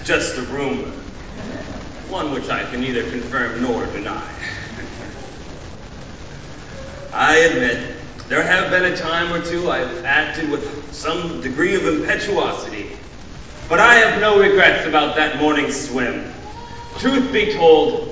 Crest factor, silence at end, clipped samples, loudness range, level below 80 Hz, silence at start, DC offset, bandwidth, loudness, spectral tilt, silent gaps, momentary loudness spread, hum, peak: 20 dB; 0 s; under 0.1%; 11 LU; -40 dBFS; 0 s; under 0.1%; 8 kHz; -17 LUFS; -4 dB/octave; none; 22 LU; none; 0 dBFS